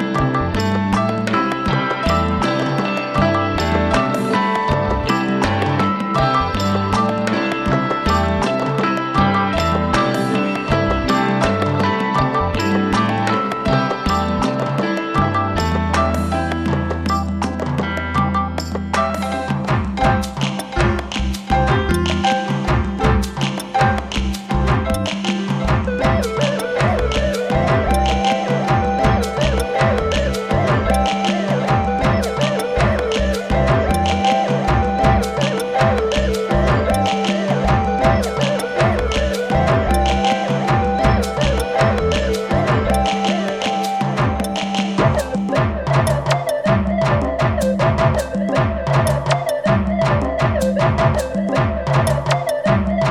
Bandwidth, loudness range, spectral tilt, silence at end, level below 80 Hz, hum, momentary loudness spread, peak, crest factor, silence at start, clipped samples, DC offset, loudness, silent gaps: 15 kHz; 2 LU; -6 dB/octave; 0 s; -28 dBFS; none; 4 LU; -2 dBFS; 16 dB; 0 s; under 0.1%; under 0.1%; -18 LUFS; none